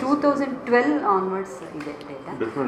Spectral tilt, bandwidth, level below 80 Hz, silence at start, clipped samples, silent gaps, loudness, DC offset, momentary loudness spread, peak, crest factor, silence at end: -6.5 dB/octave; 10.5 kHz; -62 dBFS; 0 s; under 0.1%; none; -22 LUFS; under 0.1%; 14 LU; -6 dBFS; 18 dB; 0 s